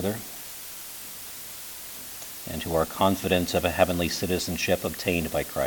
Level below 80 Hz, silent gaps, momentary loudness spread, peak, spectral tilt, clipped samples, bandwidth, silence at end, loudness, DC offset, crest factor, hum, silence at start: -48 dBFS; none; 13 LU; -4 dBFS; -4 dB/octave; under 0.1%; 19 kHz; 0 s; -28 LUFS; under 0.1%; 24 dB; none; 0 s